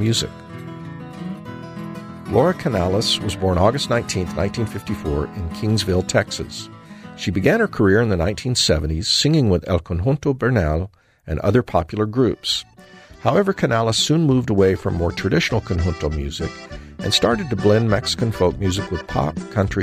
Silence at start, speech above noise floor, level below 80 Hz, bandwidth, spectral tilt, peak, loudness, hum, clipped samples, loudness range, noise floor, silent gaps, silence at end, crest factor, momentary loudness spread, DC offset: 0 s; 25 dB; -36 dBFS; 15.5 kHz; -5 dB/octave; -2 dBFS; -20 LUFS; none; under 0.1%; 4 LU; -44 dBFS; none; 0 s; 18 dB; 16 LU; under 0.1%